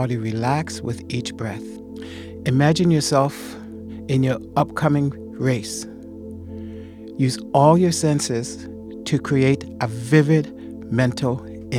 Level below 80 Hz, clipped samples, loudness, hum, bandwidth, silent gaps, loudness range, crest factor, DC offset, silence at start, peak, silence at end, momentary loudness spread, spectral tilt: -50 dBFS; under 0.1%; -21 LUFS; none; 15 kHz; none; 4 LU; 20 dB; under 0.1%; 0 s; 0 dBFS; 0 s; 18 LU; -6 dB/octave